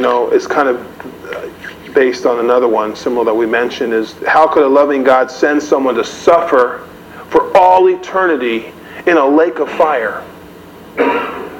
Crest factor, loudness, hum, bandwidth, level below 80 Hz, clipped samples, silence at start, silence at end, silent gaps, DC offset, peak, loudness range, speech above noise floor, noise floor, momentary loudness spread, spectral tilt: 12 dB; -12 LUFS; none; 17 kHz; -52 dBFS; 0.2%; 0 s; 0 s; none; under 0.1%; 0 dBFS; 3 LU; 23 dB; -35 dBFS; 16 LU; -4.5 dB/octave